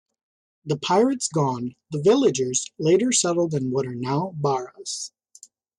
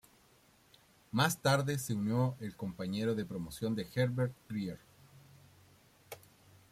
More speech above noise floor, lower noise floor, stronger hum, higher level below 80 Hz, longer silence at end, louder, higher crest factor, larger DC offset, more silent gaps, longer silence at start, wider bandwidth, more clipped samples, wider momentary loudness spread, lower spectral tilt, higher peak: about the same, 30 dB vs 32 dB; second, -52 dBFS vs -66 dBFS; neither; about the same, -66 dBFS vs -68 dBFS; first, 0.7 s vs 0.55 s; first, -23 LUFS vs -35 LUFS; second, 16 dB vs 22 dB; neither; neither; second, 0.65 s vs 1.15 s; second, 11.5 kHz vs 16 kHz; neither; second, 13 LU vs 19 LU; about the same, -4.5 dB/octave vs -5.5 dB/octave; first, -8 dBFS vs -16 dBFS